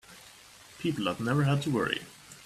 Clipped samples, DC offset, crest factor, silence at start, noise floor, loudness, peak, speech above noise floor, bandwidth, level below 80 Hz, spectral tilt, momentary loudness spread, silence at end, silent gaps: under 0.1%; under 0.1%; 22 dB; 0.1 s; -53 dBFS; -30 LUFS; -10 dBFS; 24 dB; 14 kHz; -64 dBFS; -6 dB/octave; 23 LU; 0 s; none